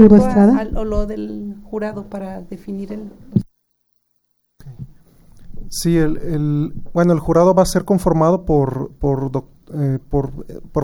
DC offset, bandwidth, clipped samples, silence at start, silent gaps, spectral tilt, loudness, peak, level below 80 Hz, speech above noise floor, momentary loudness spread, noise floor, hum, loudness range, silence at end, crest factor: under 0.1%; 16.5 kHz; under 0.1%; 0 s; none; -7.5 dB/octave; -18 LUFS; 0 dBFS; -32 dBFS; 51 dB; 17 LU; -67 dBFS; none; 13 LU; 0 s; 18 dB